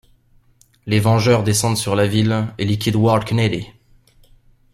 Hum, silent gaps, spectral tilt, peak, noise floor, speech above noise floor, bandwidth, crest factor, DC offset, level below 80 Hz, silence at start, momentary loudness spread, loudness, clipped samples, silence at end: none; none; -5.5 dB/octave; -2 dBFS; -55 dBFS; 38 dB; 14.5 kHz; 16 dB; under 0.1%; -48 dBFS; 0.85 s; 6 LU; -17 LUFS; under 0.1%; 1.05 s